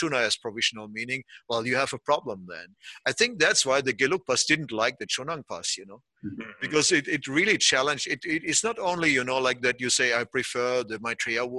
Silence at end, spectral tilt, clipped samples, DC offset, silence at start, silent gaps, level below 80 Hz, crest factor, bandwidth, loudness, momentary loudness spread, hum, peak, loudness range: 0 s; -2 dB/octave; under 0.1%; under 0.1%; 0 s; none; -66 dBFS; 20 dB; 12.5 kHz; -25 LUFS; 13 LU; none; -6 dBFS; 3 LU